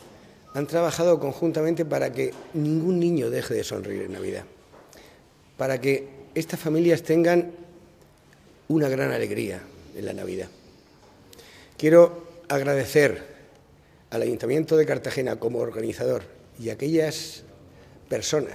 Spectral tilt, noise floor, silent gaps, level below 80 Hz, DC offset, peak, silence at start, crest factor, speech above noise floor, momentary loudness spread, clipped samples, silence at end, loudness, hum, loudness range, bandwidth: -6 dB/octave; -55 dBFS; none; -62 dBFS; under 0.1%; -4 dBFS; 0 s; 22 dB; 31 dB; 14 LU; under 0.1%; 0 s; -24 LUFS; none; 7 LU; 16 kHz